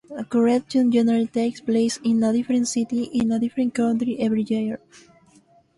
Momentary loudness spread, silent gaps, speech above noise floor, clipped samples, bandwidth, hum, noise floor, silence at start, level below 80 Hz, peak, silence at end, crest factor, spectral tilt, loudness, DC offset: 5 LU; none; 35 dB; under 0.1%; 11.5 kHz; none; -56 dBFS; 0.1 s; -60 dBFS; -8 dBFS; 1 s; 14 dB; -5.5 dB/octave; -22 LUFS; under 0.1%